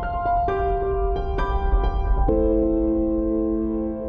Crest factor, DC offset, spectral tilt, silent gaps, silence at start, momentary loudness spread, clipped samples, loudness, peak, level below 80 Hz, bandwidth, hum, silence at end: 12 dB; under 0.1%; -10 dB/octave; none; 0 s; 5 LU; under 0.1%; -23 LUFS; -8 dBFS; -26 dBFS; 5.2 kHz; none; 0 s